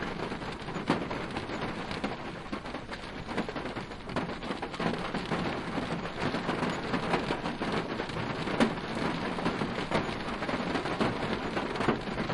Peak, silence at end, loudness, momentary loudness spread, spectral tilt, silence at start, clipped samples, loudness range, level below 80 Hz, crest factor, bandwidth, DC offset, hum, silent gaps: -12 dBFS; 0 s; -33 LUFS; 7 LU; -5.5 dB/octave; 0 s; under 0.1%; 5 LU; -50 dBFS; 20 dB; 11.5 kHz; under 0.1%; none; none